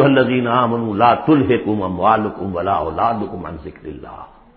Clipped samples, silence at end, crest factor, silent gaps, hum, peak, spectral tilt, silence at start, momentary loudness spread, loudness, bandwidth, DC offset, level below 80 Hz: under 0.1%; 0.3 s; 16 dB; none; none; 0 dBFS; -12 dB/octave; 0 s; 18 LU; -17 LUFS; 5.2 kHz; under 0.1%; -42 dBFS